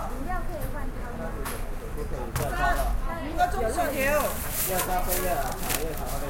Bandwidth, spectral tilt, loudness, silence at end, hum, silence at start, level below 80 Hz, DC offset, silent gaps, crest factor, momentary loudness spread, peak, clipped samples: 17 kHz; -4 dB/octave; -29 LUFS; 0 s; none; 0 s; -32 dBFS; under 0.1%; none; 18 dB; 10 LU; -8 dBFS; under 0.1%